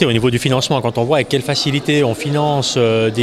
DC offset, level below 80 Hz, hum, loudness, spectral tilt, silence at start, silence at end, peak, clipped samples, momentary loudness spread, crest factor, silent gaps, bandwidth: under 0.1%; -46 dBFS; none; -16 LUFS; -5 dB/octave; 0 s; 0 s; 0 dBFS; under 0.1%; 3 LU; 16 dB; none; 14 kHz